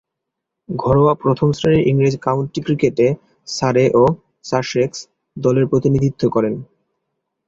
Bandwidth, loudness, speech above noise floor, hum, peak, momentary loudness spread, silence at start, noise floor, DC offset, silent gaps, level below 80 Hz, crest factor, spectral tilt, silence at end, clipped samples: 7.8 kHz; -17 LUFS; 64 dB; none; -2 dBFS; 13 LU; 0.7 s; -80 dBFS; under 0.1%; none; -44 dBFS; 16 dB; -7 dB/octave; 0.85 s; under 0.1%